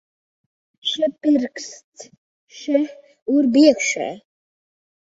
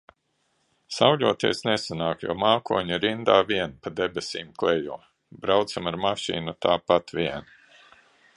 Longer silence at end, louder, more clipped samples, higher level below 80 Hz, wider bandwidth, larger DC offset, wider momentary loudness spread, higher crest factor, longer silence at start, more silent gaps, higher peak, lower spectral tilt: about the same, 0.85 s vs 0.95 s; first, -19 LUFS vs -25 LUFS; neither; second, -70 dBFS vs -58 dBFS; second, 8 kHz vs 11.5 kHz; neither; first, 20 LU vs 11 LU; about the same, 20 dB vs 22 dB; about the same, 0.85 s vs 0.9 s; first, 1.84-1.92 s, 2.18-2.47 s, 3.22-3.26 s vs none; about the same, -2 dBFS vs -2 dBFS; second, -3 dB/octave vs -4.5 dB/octave